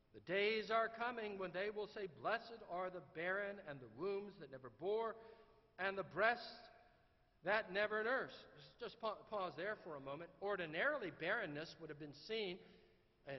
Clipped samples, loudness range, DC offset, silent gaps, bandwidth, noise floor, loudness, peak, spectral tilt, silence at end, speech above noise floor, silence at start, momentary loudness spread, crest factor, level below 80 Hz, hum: under 0.1%; 4 LU; under 0.1%; none; 6 kHz; -74 dBFS; -44 LUFS; -22 dBFS; -2 dB/octave; 0 s; 30 dB; 0.15 s; 16 LU; 22 dB; -78 dBFS; none